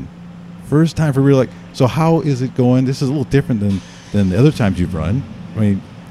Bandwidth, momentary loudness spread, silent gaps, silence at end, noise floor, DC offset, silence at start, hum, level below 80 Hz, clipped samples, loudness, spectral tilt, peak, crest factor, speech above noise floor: 12.5 kHz; 10 LU; none; 0 s; -34 dBFS; under 0.1%; 0 s; none; -40 dBFS; under 0.1%; -16 LUFS; -8 dB/octave; 0 dBFS; 16 dB; 19 dB